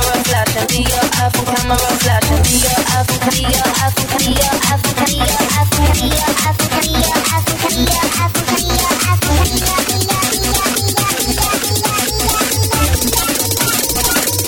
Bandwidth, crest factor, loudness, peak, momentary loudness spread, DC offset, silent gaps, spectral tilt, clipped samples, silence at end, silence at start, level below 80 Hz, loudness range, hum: over 20 kHz; 14 dB; -13 LUFS; 0 dBFS; 2 LU; under 0.1%; none; -3 dB/octave; under 0.1%; 0 s; 0 s; -24 dBFS; 1 LU; none